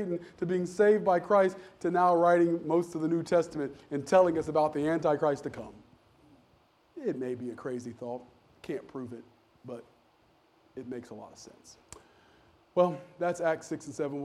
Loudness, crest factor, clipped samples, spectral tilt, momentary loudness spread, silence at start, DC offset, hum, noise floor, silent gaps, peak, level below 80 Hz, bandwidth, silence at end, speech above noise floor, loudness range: -29 LUFS; 20 dB; under 0.1%; -6.5 dB/octave; 21 LU; 0 s; under 0.1%; none; -66 dBFS; none; -12 dBFS; -68 dBFS; 12 kHz; 0 s; 36 dB; 18 LU